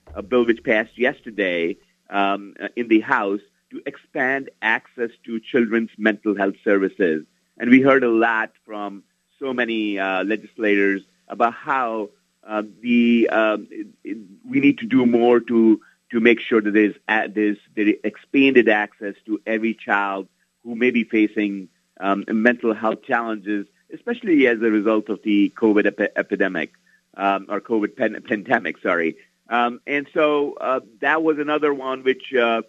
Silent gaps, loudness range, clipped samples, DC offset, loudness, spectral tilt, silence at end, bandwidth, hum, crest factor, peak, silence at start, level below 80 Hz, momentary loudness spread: none; 4 LU; under 0.1%; under 0.1%; -20 LUFS; -7 dB/octave; 0.05 s; 7.2 kHz; none; 20 dB; 0 dBFS; 0.1 s; -64 dBFS; 13 LU